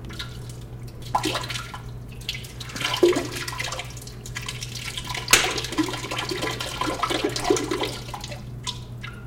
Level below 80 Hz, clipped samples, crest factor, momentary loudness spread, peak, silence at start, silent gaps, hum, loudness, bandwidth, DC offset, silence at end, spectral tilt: -44 dBFS; under 0.1%; 24 dB; 16 LU; -2 dBFS; 0 s; none; 60 Hz at -40 dBFS; -26 LUFS; 17 kHz; under 0.1%; 0 s; -3 dB/octave